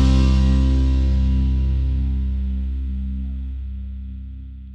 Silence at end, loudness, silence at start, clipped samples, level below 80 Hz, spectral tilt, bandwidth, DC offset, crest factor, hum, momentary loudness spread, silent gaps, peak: 0 s; -21 LUFS; 0 s; under 0.1%; -20 dBFS; -8 dB/octave; 7 kHz; under 0.1%; 14 dB; none; 16 LU; none; -6 dBFS